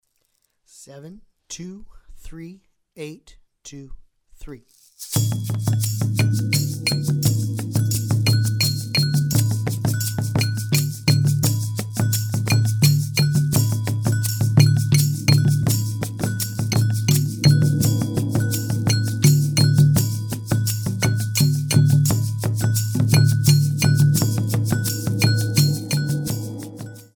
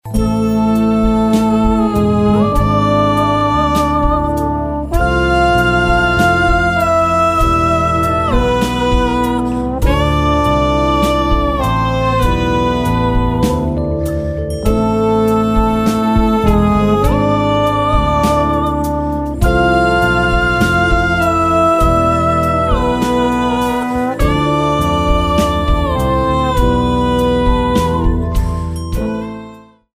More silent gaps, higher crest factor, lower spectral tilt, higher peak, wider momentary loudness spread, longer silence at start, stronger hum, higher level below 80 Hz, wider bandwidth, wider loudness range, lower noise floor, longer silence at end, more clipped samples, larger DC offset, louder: neither; first, 18 dB vs 12 dB; second, -5 dB/octave vs -6.5 dB/octave; about the same, -2 dBFS vs 0 dBFS; first, 11 LU vs 5 LU; first, 0.8 s vs 0.05 s; neither; second, -48 dBFS vs -20 dBFS; first, over 20 kHz vs 16 kHz; first, 9 LU vs 2 LU; first, -69 dBFS vs -36 dBFS; second, 0.15 s vs 0.35 s; neither; neither; second, -20 LUFS vs -14 LUFS